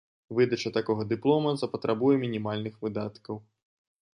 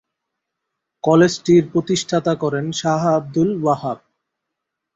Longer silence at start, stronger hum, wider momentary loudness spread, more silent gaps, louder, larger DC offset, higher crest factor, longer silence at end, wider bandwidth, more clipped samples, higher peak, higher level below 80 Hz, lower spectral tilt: second, 0.3 s vs 1.05 s; neither; first, 11 LU vs 8 LU; neither; second, -28 LUFS vs -18 LUFS; neither; about the same, 18 dB vs 18 dB; second, 0.8 s vs 1 s; first, 10.5 kHz vs 8 kHz; neither; second, -10 dBFS vs -2 dBFS; second, -66 dBFS vs -56 dBFS; about the same, -7 dB/octave vs -6 dB/octave